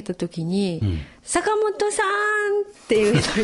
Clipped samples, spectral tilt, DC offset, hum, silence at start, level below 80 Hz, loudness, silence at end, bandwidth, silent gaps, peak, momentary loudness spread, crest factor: under 0.1%; -4.5 dB/octave; under 0.1%; none; 0 s; -44 dBFS; -22 LUFS; 0 s; 11.5 kHz; none; -4 dBFS; 8 LU; 16 dB